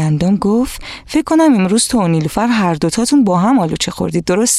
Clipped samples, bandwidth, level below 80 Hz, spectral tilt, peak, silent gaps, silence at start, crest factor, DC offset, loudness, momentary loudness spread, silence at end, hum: under 0.1%; 15.5 kHz; -38 dBFS; -5 dB/octave; -2 dBFS; none; 0 s; 10 dB; under 0.1%; -14 LUFS; 7 LU; 0 s; none